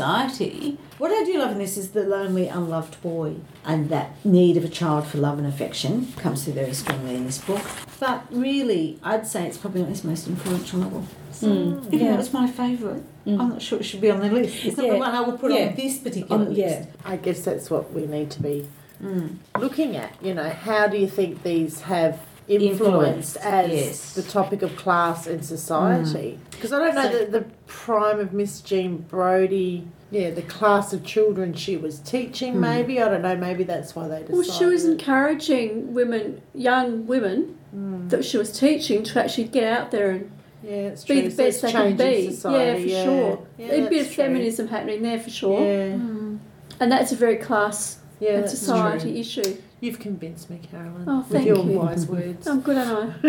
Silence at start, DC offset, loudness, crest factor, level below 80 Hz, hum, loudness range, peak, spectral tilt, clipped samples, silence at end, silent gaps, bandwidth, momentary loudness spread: 0 s; under 0.1%; -23 LUFS; 18 dB; -60 dBFS; none; 4 LU; -4 dBFS; -5.5 dB/octave; under 0.1%; 0 s; none; 19 kHz; 10 LU